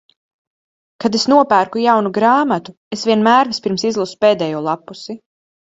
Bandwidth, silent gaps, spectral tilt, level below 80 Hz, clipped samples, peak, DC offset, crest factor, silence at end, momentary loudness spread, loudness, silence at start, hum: 8 kHz; 2.77-2.91 s; -4.5 dB/octave; -62 dBFS; under 0.1%; 0 dBFS; under 0.1%; 16 dB; 0.6 s; 15 LU; -15 LUFS; 1 s; none